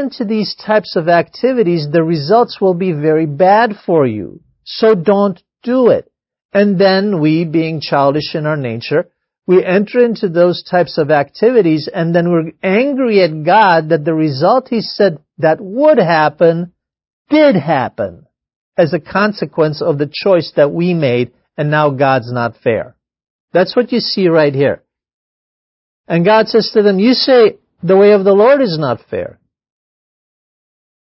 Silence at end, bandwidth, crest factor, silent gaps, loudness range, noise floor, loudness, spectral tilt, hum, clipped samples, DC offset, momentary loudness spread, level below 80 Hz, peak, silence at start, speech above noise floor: 1.8 s; 5.8 kHz; 12 dB; 6.45-6.49 s, 17.13-17.25 s, 18.56-18.72 s, 23.30-23.48 s, 25.14-26.04 s; 4 LU; under -90 dBFS; -13 LUFS; -9.5 dB/octave; none; under 0.1%; under 0.1%; 8 LU; -56 dBFS; 0 dBFS; 0 s; over 78 dB